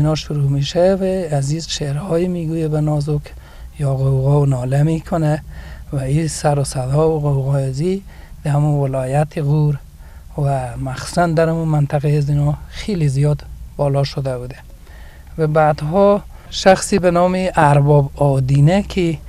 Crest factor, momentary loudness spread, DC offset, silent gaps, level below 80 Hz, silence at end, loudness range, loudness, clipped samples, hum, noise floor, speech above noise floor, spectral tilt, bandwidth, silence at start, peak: 16 dB; 10 LU; under 0.1%; none; -36 dBFS; 0 s; 5 LU; -17 LUFS; under 0.1%; none; -37 dBFS; 21 dB; -7 dB/octave; 12.5 kHz; 0 s; 0 dBFS